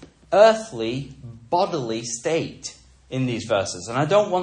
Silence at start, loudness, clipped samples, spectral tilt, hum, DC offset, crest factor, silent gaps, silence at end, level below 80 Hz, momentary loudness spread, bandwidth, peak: 0 s; -22 LUFS; under 0.1%; -4.5 dB/octave; none; under 0.1%; 20 dB; none; 0 s; -56 dBFS; 17 LU; 10 kHz; -2 dBFS